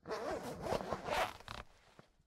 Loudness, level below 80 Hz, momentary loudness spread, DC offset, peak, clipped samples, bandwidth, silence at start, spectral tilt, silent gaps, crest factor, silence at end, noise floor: -41 LUFS; -60 dBFS; 13 LU; under 0.1%; -20 dBFS; under 0.1%; 16 kHz; 0.05 s; -4 dB/octave; none; 22 dB; 0.35 s; -65 dBFS